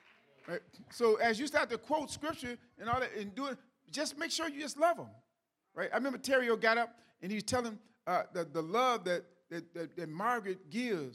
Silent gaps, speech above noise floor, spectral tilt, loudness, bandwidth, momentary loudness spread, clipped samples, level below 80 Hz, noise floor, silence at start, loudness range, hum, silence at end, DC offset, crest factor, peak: none; 47 dB; -3.5 dB/octave; -35 LUFS; 15.5 kHz; 14 LU; under 0.1%; -70 dBFS; -82 dBFS; 0.45 s; 3 LU; none; 0 s; under 0.1%; 20 dB; -14 dBFS